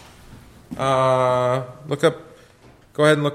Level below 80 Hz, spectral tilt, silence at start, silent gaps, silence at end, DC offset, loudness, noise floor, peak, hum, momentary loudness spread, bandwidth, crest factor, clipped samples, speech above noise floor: -54 dBFS; -6 dB/octave; 0.3 s; none; 0 s; under 0.1%; -20 LUFS; -50 dBFS; -4 dBFS; none; 17 LU; 14.5 kHz; 18 dB; under 0.1%; 31 dB